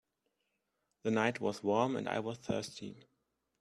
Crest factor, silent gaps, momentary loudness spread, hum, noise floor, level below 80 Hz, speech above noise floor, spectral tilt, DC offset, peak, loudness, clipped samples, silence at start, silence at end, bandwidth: 22 dB; none; 12 LU; none; -83 dBFS; -74 dBFS; 48 dB; -5.5 dB/octave; under 0.1%; -14 dBFS; -35 LUFS; under 0.1%; 1.05 s; 0.6 s; 12.5 kHz